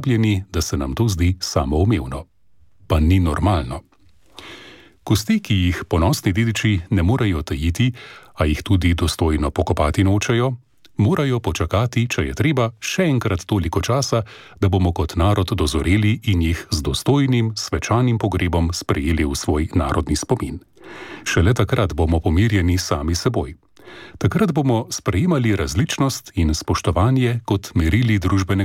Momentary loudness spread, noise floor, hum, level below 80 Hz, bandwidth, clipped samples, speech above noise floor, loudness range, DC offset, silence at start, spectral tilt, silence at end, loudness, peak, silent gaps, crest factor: 6 LU; -57 dBFS; none; -30 dBFS; 16 kHz; under 0.1%; 39 dB; 2 LU; under 0.1%; 0 s; -6 dB/octave; 0 s; -19 LUFS; -4 dBFS; none; 14 dB